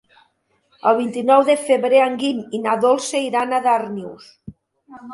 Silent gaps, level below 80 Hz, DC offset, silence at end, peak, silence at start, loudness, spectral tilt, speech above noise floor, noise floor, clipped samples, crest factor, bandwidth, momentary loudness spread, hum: none; -64 dBFS; under 0.1%; 0 s; -2 dBFS; 0.85 s; -18 LUFS; -4 dB/octave; 47 dB; -64 dBFS; under 0.1%; 18 dB; 11.5 kHz; 11 LU; none